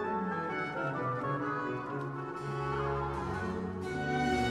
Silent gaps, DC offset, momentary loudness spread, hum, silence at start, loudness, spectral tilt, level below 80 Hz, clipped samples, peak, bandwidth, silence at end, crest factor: none; under 0.1%; 6 LU; none; 0 s; -35 LUFS; -6.5 dB/octave; -52 dBFS; under 0.1%; -20 dBFS; 12.5 kHz; 0 s; 14 dB